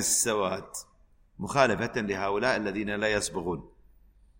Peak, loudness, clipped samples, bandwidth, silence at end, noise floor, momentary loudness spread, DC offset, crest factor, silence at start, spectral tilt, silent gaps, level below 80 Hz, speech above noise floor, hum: -8 dBFS; -28 LUFS; under 0.1%; 16.5 kHz; 0.7 s; -60 dBFS; 14 LU; under 0.1%; 22 dB; 0 s; -3 dB/octave; none; -54 dBFS; 32 dB; none